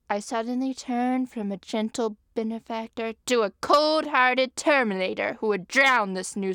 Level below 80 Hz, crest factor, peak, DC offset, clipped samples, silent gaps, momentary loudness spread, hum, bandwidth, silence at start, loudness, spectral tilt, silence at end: -66 dBFS; 18 dB; -6 dBFS; under 0.1%; under 0.1%; none; 11 LU; none; 18.5 kHz; 0.1 s; -25 LUFS; -3.5 dB/octave; 0 s